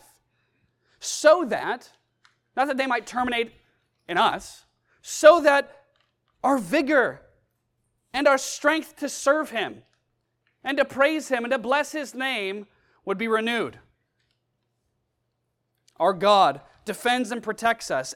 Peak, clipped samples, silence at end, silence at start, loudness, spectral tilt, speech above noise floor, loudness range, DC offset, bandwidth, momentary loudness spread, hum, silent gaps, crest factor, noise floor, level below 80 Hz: 0 dBFS; under 0.1%; 0 s; 1 s; -23 LUFS; -3 dB/octave; 54 dB; 6 LU; under 0.1%; 15.5 kHz; 15 LU; none; none; 24 dB; -76 dBFS; -64 dBFS